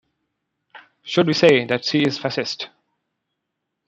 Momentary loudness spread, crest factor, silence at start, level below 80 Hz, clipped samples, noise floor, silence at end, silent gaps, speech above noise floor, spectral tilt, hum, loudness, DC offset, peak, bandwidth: 16 LU; 22 dB; 1.05 s; -66 dBFS; under 0.1%; -79 dBFS; 1.2 s; none; 60 dB; -5 dB/octave; none; -19 LUFS; under 0.1%; 0 dBFS; 8.2 kHz